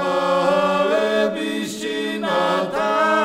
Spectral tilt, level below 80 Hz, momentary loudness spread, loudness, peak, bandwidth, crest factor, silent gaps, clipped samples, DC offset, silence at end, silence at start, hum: -4.5 dB/octave; -60 dBFS; 7 LU; -20 LUFS; -6 dBFS; 16 kHz; 14 dB; none; under 0.1%; under 0.1%; 0 s; 0 s; none